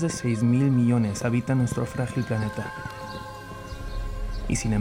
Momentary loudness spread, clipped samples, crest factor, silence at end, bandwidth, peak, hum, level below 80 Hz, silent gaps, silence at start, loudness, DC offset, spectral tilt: 16 LU; under 0.1%; 14 dB; 0 s; 15.5 kHz; -12 dBFS; none; -38 dBFS; none; 0 s; -26 LUFS; under 0.1%; -6.5 dB/octave